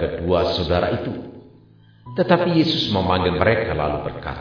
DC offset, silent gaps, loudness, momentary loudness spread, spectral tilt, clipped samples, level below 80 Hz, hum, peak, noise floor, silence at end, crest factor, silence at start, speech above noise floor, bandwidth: under 0.1%; none; -20 LUFS; 12 LU; -7 dB/octave; under 0.1%; -40 dBFS; none; -2 dBFS; -50 dBFS; 0 s; 20 dB; 0 s; 30 dB; 5.4 kHz